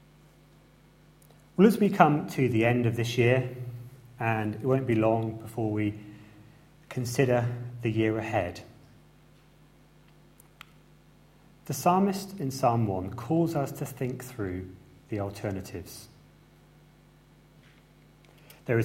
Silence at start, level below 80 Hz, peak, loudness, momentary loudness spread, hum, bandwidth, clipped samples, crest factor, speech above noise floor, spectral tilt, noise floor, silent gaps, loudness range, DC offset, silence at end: 1.6 s; -62 dBFS; -2 dBFS; -28 LUFS; 18 LU; none; 16.5 kHz; under 0.1%; 26 dB; 31 dB; -7 dB/octave; -58 dBFS; none; 14 LU; under 0.1%; 0 s